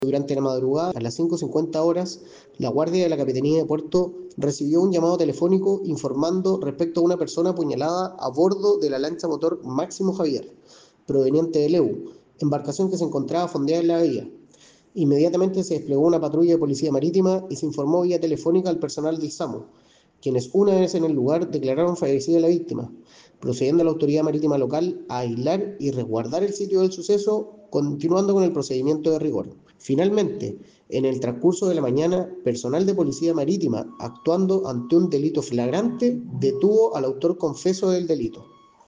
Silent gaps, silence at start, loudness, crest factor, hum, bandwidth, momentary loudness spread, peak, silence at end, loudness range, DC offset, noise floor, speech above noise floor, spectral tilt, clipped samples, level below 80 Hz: none; 0 s; -22 LUFS; 14 dB; none; 9.6 kHz; 8 LU; -8 dBFS; 0.45 s; 2 LU; under 0.1%; -53 dBFS; 32 dB; -7 dB/octave; under 0.1%; -64 dBFS